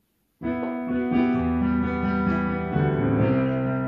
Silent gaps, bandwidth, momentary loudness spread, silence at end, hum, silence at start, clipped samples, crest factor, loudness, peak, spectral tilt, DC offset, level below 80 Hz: none; 5.2 kHz; 6 LU; 0 s; none; 0.4 s; under 0.1%; 14 dB; -24 LUFS; -10 dBFS; -10.5 dB/octave; under 0.1%; -42 dBFS